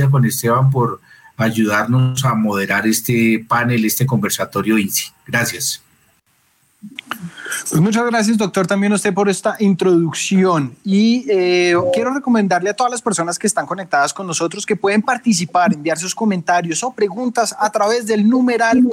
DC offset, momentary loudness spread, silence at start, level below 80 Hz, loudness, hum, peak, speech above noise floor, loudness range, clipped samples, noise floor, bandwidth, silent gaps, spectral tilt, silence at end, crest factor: under 0.1%; 6 LU; 0 s; -60 dBFS; -16 LUFS; none; -4 dBFS; 43 dB; 5 LU; under 0.1%; -59 dBFS; 17.5 kHz; none; -5 dB/octave; 0 s; 12 dB